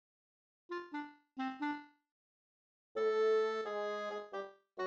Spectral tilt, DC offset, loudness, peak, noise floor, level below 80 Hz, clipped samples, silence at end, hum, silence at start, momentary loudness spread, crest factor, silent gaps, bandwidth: -4.5 dB/octave; under 0.1%; -38 LUFS; -24 dBFS; under -90 dBFS; under -90 dBFS; under 0.1%; 0 s; none; 0.7 s; 15 LU; 16 dB; 2.11-2.95 s; 7.4 kHz